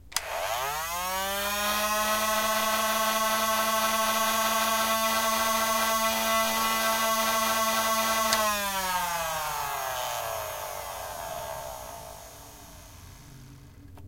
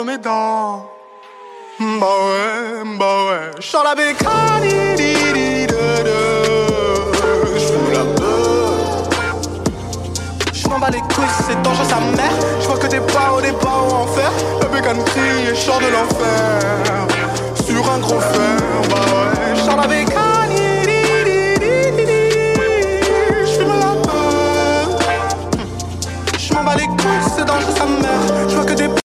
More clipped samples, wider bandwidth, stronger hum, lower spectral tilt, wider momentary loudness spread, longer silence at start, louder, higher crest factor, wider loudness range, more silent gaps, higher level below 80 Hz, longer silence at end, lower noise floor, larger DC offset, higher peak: neither; about the same, 16.5 kHz vs 15 kHz; neither; second, -1 dB/octave vs -4.5 dB/octave; first, 12 LU vs 6 LU; about the same, 0.05 s vs 0 s; second, -26 LUFS vs -15 LUFS; first, 22 dB vs 14 dB; first, 11 LU vs 3 LU; neither; second, -54 dBFS vs -36 dBFS; about the same, 0 s vs 0.05 s; first, -48 dBFS vs -38 dBFS; neither; second, -6 dBFS vs -2 dBFS